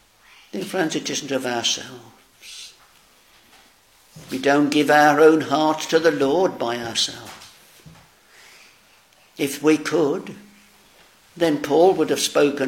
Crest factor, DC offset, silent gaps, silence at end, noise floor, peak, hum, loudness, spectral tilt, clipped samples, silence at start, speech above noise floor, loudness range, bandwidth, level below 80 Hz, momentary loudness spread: 20 dB; under 0.1%; none; 0 s; -55 dBFS; -2 dBFS; none; -19 LUFS; -3.5 dB/octave; under 0.1%; 0.55 s; 35 dB; 9 LU; 17 kHz; -66 dBFS; 22 LU